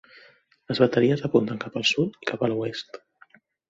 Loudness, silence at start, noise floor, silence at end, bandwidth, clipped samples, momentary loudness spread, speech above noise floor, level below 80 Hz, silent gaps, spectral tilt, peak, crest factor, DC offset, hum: -24 LUFS; 0.7 s; -57 dBFS; 0.75 s; 7.8 kHz; under 0.1%; 14 LU; 33 dB; -64 dBFS; none; -5.5 dB/octave; -4 dBFS; 22 dB; under 0.1%; none